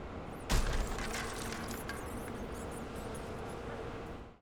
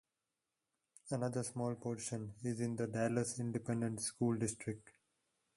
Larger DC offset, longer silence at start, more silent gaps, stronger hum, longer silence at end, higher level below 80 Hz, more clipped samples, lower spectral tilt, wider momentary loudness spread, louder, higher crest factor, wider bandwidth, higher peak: neither; second, 0 s vs 1.05 s; neither; neither; second, 0.05 s vs 0.65 s; first, -42 dBFS vs -72 dBFS; neither; about the same, -4.5 dB/octave vs -5.5 dB/octave; about the same, 8 LU vs 7 LU; about the same, -40 LUFS vs -40 LUFS; about the same, 20 dB vs 18 dB; first, over 20 kHz vs 11.5 kHz; first, -18 dBFS vs -22 dBFS